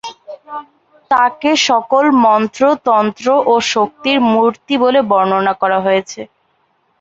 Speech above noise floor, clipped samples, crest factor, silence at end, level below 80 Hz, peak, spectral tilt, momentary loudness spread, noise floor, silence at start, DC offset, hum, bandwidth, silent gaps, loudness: 47 dB; under 0.1%; 12 dB; 0.75 s; -60 dBFS; 0 dBFS; -4 dB/octave; 17 LU; -60 dBFS; 0.05 s; under 0.1%; none; 8 kHz; none; -13 LUFS